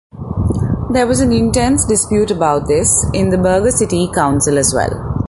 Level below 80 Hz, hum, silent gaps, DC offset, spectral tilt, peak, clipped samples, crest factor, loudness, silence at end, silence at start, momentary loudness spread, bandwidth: -28 dBFS; none; none; under 0.1%; -5 dB/octave; 0 dBFS; under 0.1%; 14 dB; -14 LUFS; 0 s; 0.15 s; 6 LU; 12 kHz